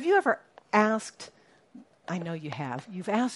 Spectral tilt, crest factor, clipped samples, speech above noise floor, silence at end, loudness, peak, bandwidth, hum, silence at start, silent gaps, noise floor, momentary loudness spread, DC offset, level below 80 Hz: -5.5 dB/octave; 22 dB; under 0.1%; 25 dB; 0 s; -29 LUFS; -8 dBFS; 11.5 kHz; none; 0 s; none; -54 dBFS; 20 LU; under 0.1%; -78 dBFS